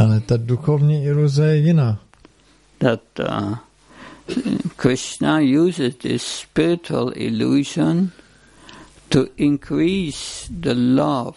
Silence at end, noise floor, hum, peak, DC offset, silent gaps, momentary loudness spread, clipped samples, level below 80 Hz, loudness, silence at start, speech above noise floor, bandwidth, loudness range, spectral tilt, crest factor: 0.05 s; -54 dBFS; none; -2 dBFS; under 0.1%; none; 9 LU; under 0.1%; -48 dBFS; -19 LUFS; 0 s; 36 dB; 11.5 kHz; 3 LU; -6.5 dB/octave; 18 dB